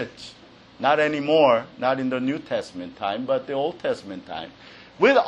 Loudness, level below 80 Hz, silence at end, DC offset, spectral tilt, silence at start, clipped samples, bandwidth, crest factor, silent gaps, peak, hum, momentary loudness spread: -23 LUFS; -64 dBFS; 0 s; under 0.1%; -5.5 dB/octave; 0 s; under 0.1%; 9.8 kHz; 18 dB; none; -4 dBFS; none; 17 LU